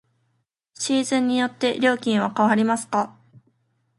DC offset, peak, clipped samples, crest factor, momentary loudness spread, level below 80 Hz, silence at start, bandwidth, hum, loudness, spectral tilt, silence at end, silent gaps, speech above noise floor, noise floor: under 0.1%; -6 dBFS; under 0.1%; 18 dB; 6 LU; -70 dBFS; 0.8 s; 11.5 kHz; none; -22 LUFS; -4 dB/octave; 0.9 s; none; 51 dB; -72 dBFS